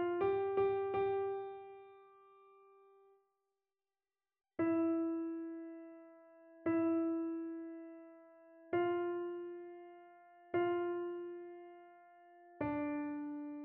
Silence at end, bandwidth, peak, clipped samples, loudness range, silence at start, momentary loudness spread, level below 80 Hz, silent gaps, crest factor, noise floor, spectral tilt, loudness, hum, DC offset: 0 s; 3.8 kHz; -24 dBFS; under 0.1%; 5 LU; 0 s; 21 LU; -76 dBFS; none; 16 dB; under -90 dBFS; -6 dB/octave; -38 LUFS; none; under 0.1%